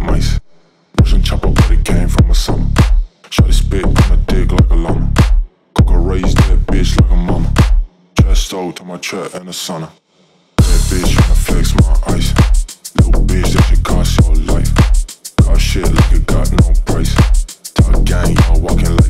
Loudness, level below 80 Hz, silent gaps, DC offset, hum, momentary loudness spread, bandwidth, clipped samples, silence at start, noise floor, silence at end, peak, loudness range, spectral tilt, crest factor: -14 LUFS; -12 dBFS; none; 3%; none; 8 LU; 14 kHz; under 0.1%; 0 s; -52 dBFS; 0 s; 0 dBFS; 3 LU; -6 dB/octave; 10 dB